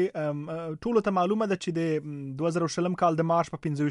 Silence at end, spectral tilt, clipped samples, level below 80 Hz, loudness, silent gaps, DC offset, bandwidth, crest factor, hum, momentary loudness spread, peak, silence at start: 0 s; -6.5 dB/octave; under 0.1%; -62 dBFS; -28 LUFS; none; under 0.1%; 11 kHz; 16 dB; none; 7 LU; -10 dBFS; 0 s